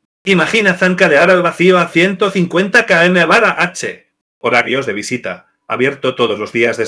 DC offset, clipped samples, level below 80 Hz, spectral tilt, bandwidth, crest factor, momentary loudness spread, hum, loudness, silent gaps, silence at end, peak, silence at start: under 0.1%; under 0.1%; -60 dBFS; -5 dB/octave; 11 kHz; 14 dB; 12 LU; none; -12 LUFS; 4.21-4.41 s; 0 s; 0 dBFS; 0.25 s